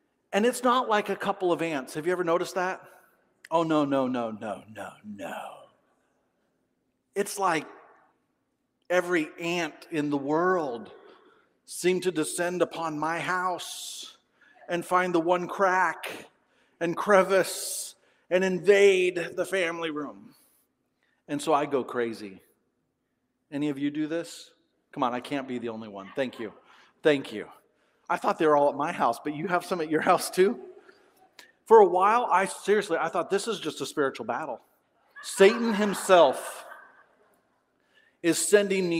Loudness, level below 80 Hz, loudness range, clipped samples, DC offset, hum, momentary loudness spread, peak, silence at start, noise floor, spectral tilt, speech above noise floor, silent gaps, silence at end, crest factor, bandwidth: -26 LUFS; -78 dBFS; 9 LU; under 0.1%; under 0.1%; none; 18 LU; -4 dBFS; 0.3 s; -77 dBFS; -4 dB/octave; 51 dB; none; 0 s; 24 dB; 16 kHz